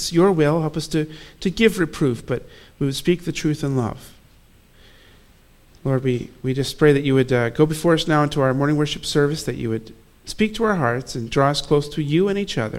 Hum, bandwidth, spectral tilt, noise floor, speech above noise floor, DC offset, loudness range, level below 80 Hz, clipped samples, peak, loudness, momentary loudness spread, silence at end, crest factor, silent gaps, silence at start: none; 16 kHz; -6 dB/octave; -51 dBFS; 31 dB; under 0.1%; 7 LU; -44 dBFS; under 0.1%; -2 dBFS; -21 LUFS; 10 LU; 0 s; 20 dB; none; 0 s